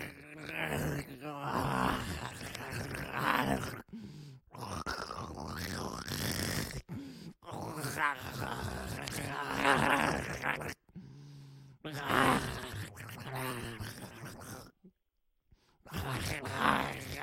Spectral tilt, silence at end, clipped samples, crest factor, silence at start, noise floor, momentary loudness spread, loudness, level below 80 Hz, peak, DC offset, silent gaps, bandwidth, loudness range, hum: -4 dB/octave; 0 s; under 0.1%; 26 dB; 0 s; -78 dBFS; 19 LU; -35 LUFS; -56 dBFS; -10 dBFS; under 0.1%; none; 16.5 kHz; 6 LU; none